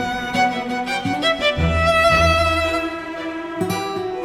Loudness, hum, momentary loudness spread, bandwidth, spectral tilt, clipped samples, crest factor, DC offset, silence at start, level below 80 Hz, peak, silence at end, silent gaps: -19 LUFS; none; 12 LU; 16 kHz; -4.5 dB/octave; under 0.1%; 16 dB; under 0.1%; 0 s; -36 dBFS; -4 dBFS; 0 s; none